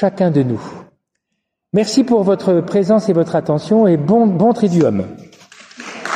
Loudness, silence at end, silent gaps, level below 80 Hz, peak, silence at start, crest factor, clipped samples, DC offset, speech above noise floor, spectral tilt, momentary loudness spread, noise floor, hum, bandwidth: -15 LUFS; 0 s; none; -60 dBFS; -2 dBFS; 0 s; 12 dB; under 0.1%; under 0.1%; 61 dB; -7 dB/octave; 14 LU; -75 dBFS; none; 10.5 kHz